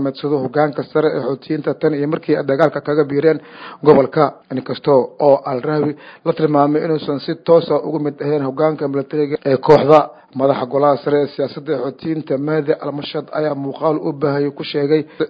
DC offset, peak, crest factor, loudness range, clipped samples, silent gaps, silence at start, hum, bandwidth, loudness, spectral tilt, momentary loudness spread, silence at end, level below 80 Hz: under 0.1%; 0 dBFS; 16 dB; 4 LU; 0.1%; none; 0 s; none; 6 kHz; -17 LUFS; -9 dB/octave; 10 LU; 0 s; -60 dBFS